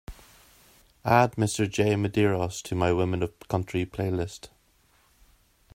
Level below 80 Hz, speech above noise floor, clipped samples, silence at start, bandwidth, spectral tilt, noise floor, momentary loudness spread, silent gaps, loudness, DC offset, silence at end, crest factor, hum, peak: -54 dBFS; 38 dB; under 0.1%; 0.1 s; 16 kHz; -6 dB/octave; -64 dBFS; 11 LU; none; -26 LUFS; under 0.1%; 1.3 s; 22 dB; none; -6 dBFS